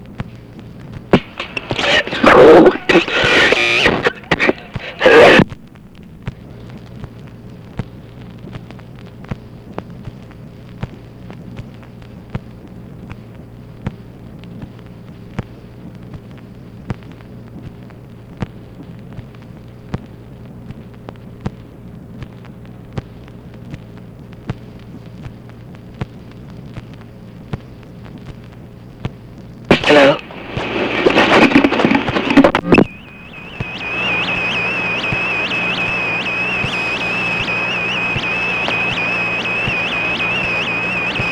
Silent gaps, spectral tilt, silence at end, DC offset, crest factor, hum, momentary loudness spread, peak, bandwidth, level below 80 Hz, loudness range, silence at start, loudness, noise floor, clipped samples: none; -5.5 dB/octave; 0 s; 0.1%; 18 dB; none; 26 LU; 0 dBFS; 15.5 kHz; -40 dBFS; 22 LU; 0 s; -13 LUFS; -38 dBFS; under 0.1%